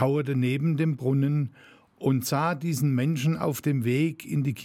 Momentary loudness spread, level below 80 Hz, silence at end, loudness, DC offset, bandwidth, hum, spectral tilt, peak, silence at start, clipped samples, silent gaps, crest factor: 4 LU; -68 dBFS; 0 s; -26 LUFS; under 0.1%; 17 kHz; none; -7 dB/octave; -8 dBFS; 0 s; under 0.1%; none; 16 dB